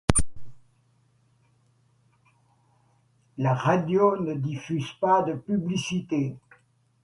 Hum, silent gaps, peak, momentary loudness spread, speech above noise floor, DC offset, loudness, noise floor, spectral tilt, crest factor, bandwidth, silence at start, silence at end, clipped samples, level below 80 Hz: none; none; 0 dBFS; 10 LU; 40 dB; under 0.1%; -26 LUFS; -65 dBFS; -5.5 dB/octave; 26 dB; 11.5 kHz; 0.1 s; 0.65 s; under 0.1%; -44 dBFS